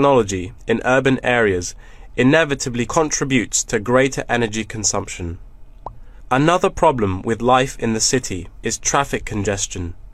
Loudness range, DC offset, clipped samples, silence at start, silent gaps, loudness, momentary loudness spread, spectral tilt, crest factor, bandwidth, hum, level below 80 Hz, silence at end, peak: 2 LU; under 0.1%; under 0.1%; 0 s; none; -18 LUFS; 13 LU; -4 dB/octave; 18 dB; 14.5 kHz; none; -38 dBFS; 0.05 s; -2 dBFS